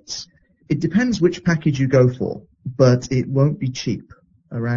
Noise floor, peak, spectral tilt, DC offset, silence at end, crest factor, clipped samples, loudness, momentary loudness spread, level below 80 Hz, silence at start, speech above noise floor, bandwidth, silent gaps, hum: -44 dBFS; -2 dBFS; -7 dB/octave; under 0.1%; 0 s; 18 dB; under 0.1%; -19 LUFS; 15 LU; -48 dBFS; 0.1 s; 27 dB; 7.4 kHz; none; none